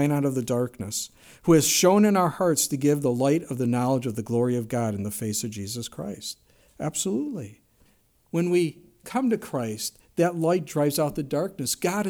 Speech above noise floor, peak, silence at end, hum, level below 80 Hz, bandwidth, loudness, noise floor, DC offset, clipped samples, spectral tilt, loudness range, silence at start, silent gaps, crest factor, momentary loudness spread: 38 dB; -6 dBFS; 0 s; none; -60 dBFS; over 20 kHz; -25 LUFS; -62 dBFS; under 0.1%; under 0.1%; -5 dB/octave; 8 LU; 0 s; none; 18 dB; 13 LU